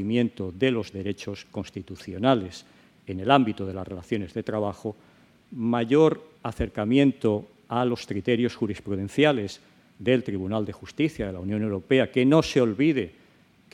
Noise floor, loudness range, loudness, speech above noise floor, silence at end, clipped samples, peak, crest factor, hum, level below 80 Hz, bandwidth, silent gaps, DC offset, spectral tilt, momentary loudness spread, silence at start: -58 dBFS; 3 LU; -25 LUFS; 33 dB; 0.65 s; under 0.1%; -2 dBFS; 22 dB; none; -52 dBFS; 11.5 kHz; none; under 0.1%; -6.5 dB/octave; 16 LU; 0 s